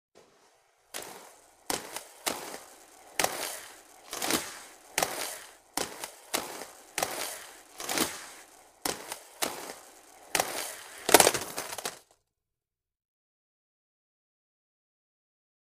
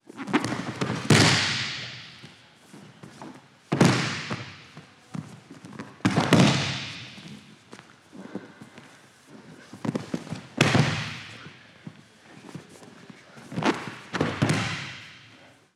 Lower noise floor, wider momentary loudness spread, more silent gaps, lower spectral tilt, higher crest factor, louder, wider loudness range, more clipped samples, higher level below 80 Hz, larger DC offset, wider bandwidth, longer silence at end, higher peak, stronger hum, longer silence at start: first, under -90 dBFS vs -53 dBFS; second, 16 LU vs 26 LU; neither; second, -1 dB/octave vs -4.5 dB/octave; first, 34 dB vs 28 dB; second, -31 LUFS vs -25 LUFS; about the same, 8 LU vs 9 LU; neither; second, -68 dBFS vs -60 dBFS; neither; about the same, 15.5 kHz vs 14.5 kHz; first, 3.8 s vs 0.55 s; about the same, -2 dBFS vs -2 dBFS; neither; first, 0.95 s vs 0.15 s